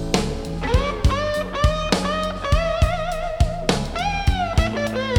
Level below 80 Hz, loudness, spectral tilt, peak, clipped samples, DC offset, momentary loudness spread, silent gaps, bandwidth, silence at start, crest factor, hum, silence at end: -26 dBFS; -22 LUFS; -5.5 dB/octave; -2 dBFS; under 0.1%; under 0.1%; 4 LU; none; 17.5 kHz; 0 s; 18 dB; none; 0 s